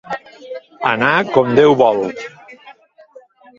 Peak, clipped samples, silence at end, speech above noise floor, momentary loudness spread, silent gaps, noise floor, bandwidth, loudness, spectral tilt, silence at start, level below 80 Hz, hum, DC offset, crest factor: 0 dBFS; under 0.1%; 0.85 s; 31 dB; 21 LU; none; -45 dBFS; 7.4 kHz; -14 LUFS; -6.5 dB/octave; 0.05 s; -58 dBFS; none; under 0.1%; 18 dB